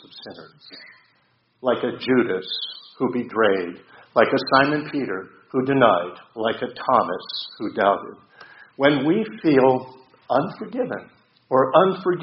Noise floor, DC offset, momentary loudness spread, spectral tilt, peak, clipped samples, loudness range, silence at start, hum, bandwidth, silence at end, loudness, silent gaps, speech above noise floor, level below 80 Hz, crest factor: -64 dBFS; under 0.1%; 15 LU; -3.5 dB/octave; 0 dBFS; under 0.1%; 3 LU; 0.15 s; none; 5.8 kHz; 0 s; -21 LUFS; none; 43 dB; -64 dBFS; 22 dB